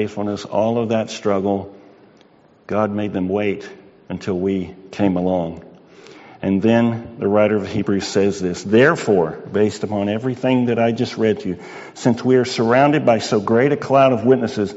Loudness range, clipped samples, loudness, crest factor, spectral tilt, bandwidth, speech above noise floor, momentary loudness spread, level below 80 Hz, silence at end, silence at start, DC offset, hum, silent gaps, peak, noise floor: 7 LU; under 0.1%; -18 LUFS; 16 dB; -5.5 dB/octave; 8 kHz; 33 dB; 11 LU; -56 dBFS; 0 s; 0 s; under 0.1%; none; none; -2 dBFS; -51 dBFS